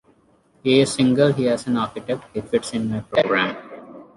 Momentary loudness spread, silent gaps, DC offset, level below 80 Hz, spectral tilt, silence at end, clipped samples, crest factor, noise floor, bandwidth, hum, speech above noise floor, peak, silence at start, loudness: 11 LU; none; under 0.1%; -56 dBFS; -5.5 dB/octave; 0.15 s; under 0.1%; 18 dB; -58 dBFS; 11.5 kHz; none; 38 dB; -4 dBFS; 0.65 s; -21 LUFS